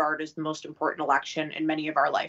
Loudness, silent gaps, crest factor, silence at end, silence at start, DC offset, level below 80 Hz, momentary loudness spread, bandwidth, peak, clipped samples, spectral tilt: -28 LUFS; none; 20 dB; 0 s; 0 s; under 0.1%; -78 dBFS; 8 LU; 8 kHz; -8 dBFS; under 0.1%; -4.5 dB/octave